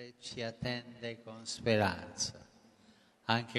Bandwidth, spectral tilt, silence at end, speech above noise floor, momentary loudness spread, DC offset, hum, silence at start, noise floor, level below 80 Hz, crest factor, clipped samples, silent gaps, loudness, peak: 13 kHz; -4 dB/octave; 0 s; 29 dB; 14 LU; under 0.1%; none; 0 s; -65 dBFS; -66 dBFS; 26 dB; under 0.1%; none; -37 LUFS; -12 dBFS